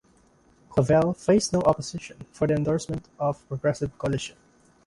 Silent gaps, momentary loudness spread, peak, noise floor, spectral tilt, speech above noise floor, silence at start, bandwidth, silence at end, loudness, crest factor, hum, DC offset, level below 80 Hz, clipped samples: none; 13 LU; -6 dBFS; -60 dBFS; -6 dB/octave; 35 dB; 0.7 s; 11.5 kHz; 0.55 s; -25 LUFS; 20 dB; none; under 0.1%; -50 dBFS; under 0.1%